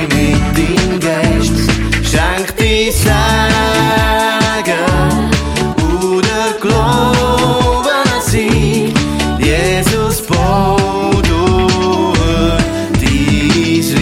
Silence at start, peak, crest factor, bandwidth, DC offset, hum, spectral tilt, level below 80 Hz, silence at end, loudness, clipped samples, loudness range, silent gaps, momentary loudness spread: 0 s; 0 dBFS; 12 dB; 17 kHz; under 0.1%; none; -5 dB/octave; -20 dBFS; 0 s; -12 LUFS; under 0.1%; 1 LU; none; 3 LU